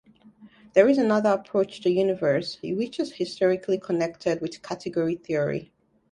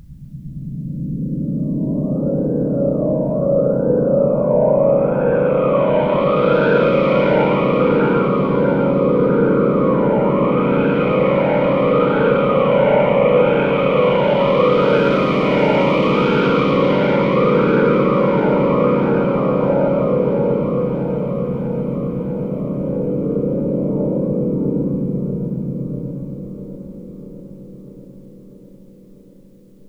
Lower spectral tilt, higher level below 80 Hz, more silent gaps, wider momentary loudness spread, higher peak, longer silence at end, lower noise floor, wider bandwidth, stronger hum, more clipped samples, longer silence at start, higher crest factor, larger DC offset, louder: second, -6.5 dB/octave vs -9.5 dB/octave; second, -66 dBFS vs -44 dBFS; neither; about the same, 10 LU vs 10 LU; about the same, -4 dBFS vs -2 dBFS; second, 0.5 s vs 1.4 s; first, -52 dBFS vs -45 dBFS; first, 11 kHz vs 6.2 kHz; neither; neither; first, 0.4 s vs 0.1 s; first, 22 dB vs 14 dB; neither; second, -25 LUFS vs -16 LUFS